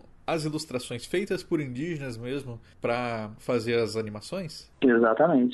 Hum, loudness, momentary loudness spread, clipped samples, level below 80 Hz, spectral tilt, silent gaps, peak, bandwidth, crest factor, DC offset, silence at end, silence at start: none; -28 LUFS; 14 LU; under 0.1%; -56 dBFS; -6 dB/octave; none; -10 dBFS; 12 kHz; 18 dB; under 0.1%; 0 s; 0.3 s